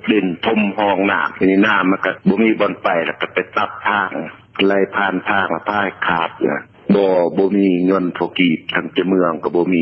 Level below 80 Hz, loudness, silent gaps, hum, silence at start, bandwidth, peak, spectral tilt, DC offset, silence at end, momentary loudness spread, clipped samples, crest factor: -54 dBFS; -17 LUFS; none; none; 0.05 s; 6 kHz; -2 dBFS; -8.5 dB/octave; under 0.1%; 0 s; 6 LU; under 0.1%; 16 dB